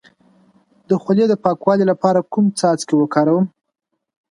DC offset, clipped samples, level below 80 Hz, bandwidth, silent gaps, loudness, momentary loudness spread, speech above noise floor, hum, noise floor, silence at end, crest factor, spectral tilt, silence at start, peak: under 0.1%; under 0.1%; -66 dBFS; 11.5 kHz; none; -17 LUFS; 4 LU; 39 dB; none; -55 dBFS; 0.85 s; 18 dB; -6.5 dB/octave; 0.9 s; 0 dBFS